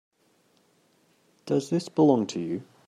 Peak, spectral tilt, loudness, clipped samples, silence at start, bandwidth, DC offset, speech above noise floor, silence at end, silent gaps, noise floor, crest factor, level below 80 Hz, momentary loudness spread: -8 dBFS; -7 dB/octave; -26 LUFS; under 0.1%; 1.45 s; 12 kHz; under 0.1%; 41 dB; 0.25 s; none; -66 dBFS; 20 dB; -76 dBFS; 12 LU